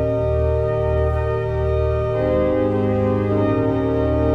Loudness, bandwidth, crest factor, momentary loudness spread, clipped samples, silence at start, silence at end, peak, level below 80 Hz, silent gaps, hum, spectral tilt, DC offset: -20 LUFS; 5.8 kHz; 12 dB; 2 LU; under 0.1%; 0 s; 0 s; -6 dBFS; -28 dBFS; none; none; -10 dB/octave; under 0.1%